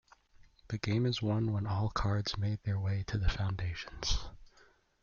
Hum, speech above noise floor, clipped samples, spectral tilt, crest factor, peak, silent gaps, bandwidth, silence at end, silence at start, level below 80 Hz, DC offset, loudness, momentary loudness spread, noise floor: none; 32 dB; under 0.1%; -5.5 dB/octave; 16 dB; -18 dBFS; none; 7.2 kHz; 0.55 s; 0.4 s; -44 dBFS; under 0.1%; -35 LUFS; 7 LU; -65 dBFS